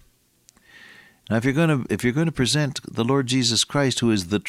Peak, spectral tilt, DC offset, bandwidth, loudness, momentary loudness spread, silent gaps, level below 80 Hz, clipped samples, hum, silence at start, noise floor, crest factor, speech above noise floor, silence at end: -8 dBFS; -4.5 dB/octave; under 0.1%; 15 kHz; -21 LUFS; 4 LU; none; -52 dBFS; under 0.1%; none; 1.3 s; -58 dBFS; 16 dB; 37 dB; 0 s